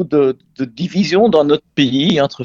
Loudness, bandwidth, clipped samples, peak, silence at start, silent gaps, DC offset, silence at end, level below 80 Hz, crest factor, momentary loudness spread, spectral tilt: -15 LUFS; 7.6 kHz; under 0.1%; 0 dBFS; 0 s; none; under 0.1%; 0 s; -52 dBFS; 14 dB; 11 LU; -6 dB/octave